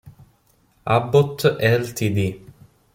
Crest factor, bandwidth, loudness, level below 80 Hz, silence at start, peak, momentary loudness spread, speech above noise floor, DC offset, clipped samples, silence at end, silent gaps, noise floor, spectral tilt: 18 dB; 16.5 kHz; -20 LUFS; -54 dBFS; 0.05 s; -4 dBFS; 11 LU; 41 dB; under 0.1%; under 0.1%; 0.55 s; none; -60 dBFS; -6 dB/octave